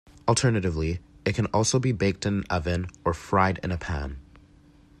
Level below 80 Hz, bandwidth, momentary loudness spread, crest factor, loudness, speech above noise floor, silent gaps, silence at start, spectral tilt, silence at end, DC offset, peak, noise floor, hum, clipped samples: -44 dBFS; 12 kHz; 8 LU; 20 dB; -26 LUFS; 29 dB; none; 0.15 s; -5 dB/octave; 0.8 s; under 0.1%; -8 dBFS; -55 dBFS; none; under 0.1%